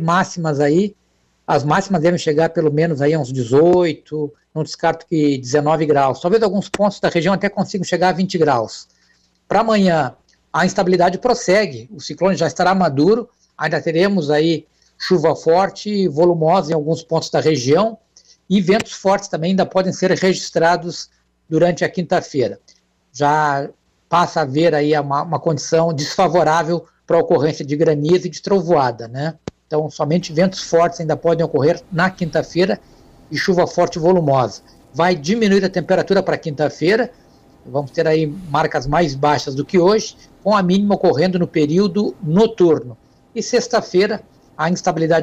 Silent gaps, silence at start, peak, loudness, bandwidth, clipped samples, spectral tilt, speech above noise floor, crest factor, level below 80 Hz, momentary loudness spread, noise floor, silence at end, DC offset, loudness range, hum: none; 0 s; -4 dBFS; -17 LUFS; 9.2 kHz; under 0.1%; -6 dB/octave; 42 dB; 12 dB; -50 dBFS; 9 LU; -58 dBFS; 0 s; under 0.1%; 2 LU; none